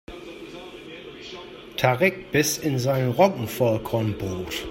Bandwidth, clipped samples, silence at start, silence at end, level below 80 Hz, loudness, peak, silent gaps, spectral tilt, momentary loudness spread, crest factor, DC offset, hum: 16.5 kHz; under 0.1%; 0.1 s; 0 s; -52 dBFS; -23 LUFS; -4 dBFS; none; -5 dB/octave; 19 LU; 22 dB; under 0.1%; none